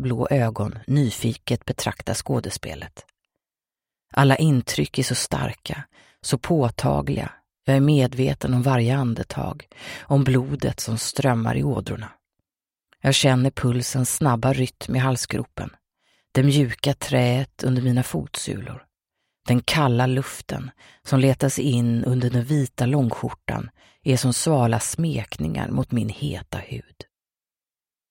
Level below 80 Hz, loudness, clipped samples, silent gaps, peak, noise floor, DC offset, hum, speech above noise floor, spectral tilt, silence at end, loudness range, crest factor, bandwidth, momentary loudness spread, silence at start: -46 dBFS; -22 LUFS; under 0.1%; none; -2 dBFS; under -90 dBFS; under 0.1%; none; over 68 dB; -5.5 dB/octave; 1.3 s; 3 LU; 22 dB; 16.5 kHz; 14 LU; 0 s